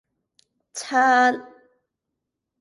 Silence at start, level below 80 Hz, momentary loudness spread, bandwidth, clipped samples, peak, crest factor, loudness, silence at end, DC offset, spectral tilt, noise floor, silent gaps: 0.75 s; -80 dBFS; 18 LU; 11.5 kHz; under 0.1%; -6 dBFS; 18 dB; -19 LUFS; 1.15 s; under 0.1%; -1.5 dB/octave; -82 dBFS; none